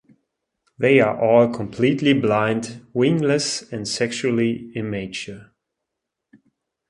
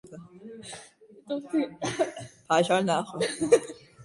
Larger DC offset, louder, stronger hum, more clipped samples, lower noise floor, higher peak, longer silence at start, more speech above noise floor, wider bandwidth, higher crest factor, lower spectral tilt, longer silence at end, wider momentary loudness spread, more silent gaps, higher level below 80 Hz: neither; first, -20 LUFS vs -27 LUFS; neither; neither; first, -82 dBFS vs -45 dBFS; first, -2 dBFS vs -6 dBFS; first, 0.8 s vs 0.05 s; first, 62 dB vs 18 dB; about the same, 11.5 kHz vs 11.5 kHz; about the same, 20 dB vs 22 dB; about the same, -5 dB/octave vs -4.5 dB/octave; first, 1.45 s vs 0 s; second, 12 LU vs 21 LU; neither; first, -58 dBFS vs -66 dBFS